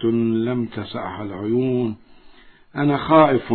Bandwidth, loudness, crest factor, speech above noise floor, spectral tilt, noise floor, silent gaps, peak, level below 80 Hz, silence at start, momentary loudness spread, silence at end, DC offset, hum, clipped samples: 4.5 kHz; -20 LUFS; 18 dB; 27 dB; -11.5 dB/octave; -47 dBFS; none; -2 dBFS; -54 dBFS; 0 s; 15 LU; 0 s; under 0.1%; none; under 0.1%